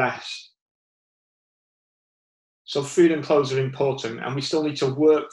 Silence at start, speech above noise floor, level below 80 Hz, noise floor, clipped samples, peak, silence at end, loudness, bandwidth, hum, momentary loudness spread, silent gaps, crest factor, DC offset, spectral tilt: 0 s; over 68 dB; -68 dBFS; under -90 dBFS; under 0.1%; -6 dBFS; 0.05 s; -23 LUFS; 11.5 kHz; none; 11 LU; 0.61-2.65 s; 18 dB; under 0.1%; -5.5 dB/octave